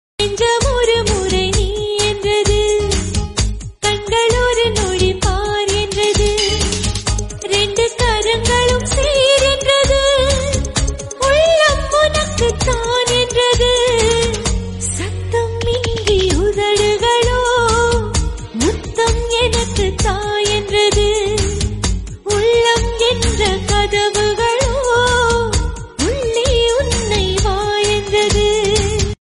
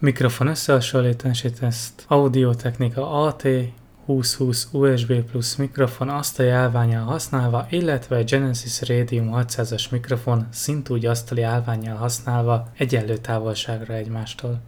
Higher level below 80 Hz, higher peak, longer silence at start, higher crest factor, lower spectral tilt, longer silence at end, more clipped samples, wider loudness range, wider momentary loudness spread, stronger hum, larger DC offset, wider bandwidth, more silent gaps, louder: first, -24 dBFS vs -50 dBFS; first, 0 dBFS vs -4 dBFS; first, 0.2 s vs 0 s; about the same, 14 dB vs 16 dB; second, -3.5 dB/octave vs -5.5 dB/octave; about the same, 0.1 s vs 0 s; neither; about the same, 3 LU vs 3 LU; about the same, 7 LU vs 7 LU; neither; neither; second, 11.5 kHz vs 18.5 kHz; neither; first, -15 LUFS vs -22 LUFS